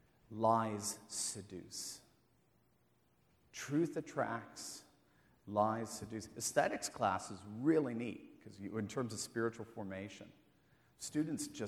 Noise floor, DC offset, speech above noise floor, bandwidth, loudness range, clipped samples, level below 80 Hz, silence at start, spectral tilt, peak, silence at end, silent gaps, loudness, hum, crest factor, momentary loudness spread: -75 dBFS; under 0.1%; 36 dB; 19 kHz; 6 LU; under 0.1%; -76 dBFS; 0.3 s; -4.5 dB/octave; -18 dBFS; 0 s; none; -39 LUFS; none; 22 dB; 16 LU